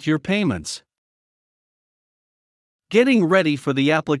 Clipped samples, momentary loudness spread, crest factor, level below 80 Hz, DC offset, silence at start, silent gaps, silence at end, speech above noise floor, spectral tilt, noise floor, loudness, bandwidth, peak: under 0.1%; 12 LU; 18 dB; -60 dBFS; under 0.1%; 0 s; 0.98-2.79 s; 0 s; over 71 dB; -5.5 dB/octave; under -90 dBFS; -19 LUFS; 12 kHz; -4 dBFS